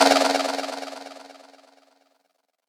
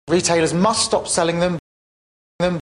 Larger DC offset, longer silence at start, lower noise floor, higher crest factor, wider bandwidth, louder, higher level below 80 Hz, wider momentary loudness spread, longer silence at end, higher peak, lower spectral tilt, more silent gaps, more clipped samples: neither; about the same, 0 s vs 0.05 s; second, -72 dBFS vs under -90 dBFS; about the same, 22 dB vs 18 dB; first, over 20 kHz vs 11 kHz; second, -23 LUFS vs -18 LUFS; second, -76 dBFS vs -48 dBFS; first, 25 LU vs 6 LU; first, 1.35 s vs 0.1 s; about the same, -4 dBFS vs -2 dBFS; second, -1 dB/octave vs -4 dB/octave; second, none vs 1.59-2.39 s; neither